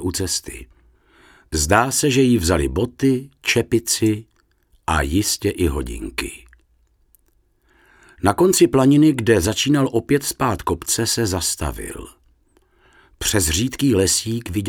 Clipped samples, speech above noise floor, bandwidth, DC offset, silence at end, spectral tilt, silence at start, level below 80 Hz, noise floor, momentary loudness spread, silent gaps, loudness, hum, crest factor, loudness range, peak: under 0.1%; 43 dB; 18 kHz; under 0.1%; 0 s; -4 dB/octave; 0 s; -36 dBFS; -61 dBFS; 13 LU; none; -19 LUFS; none; 20 dB; 7 LU; 0 dBFS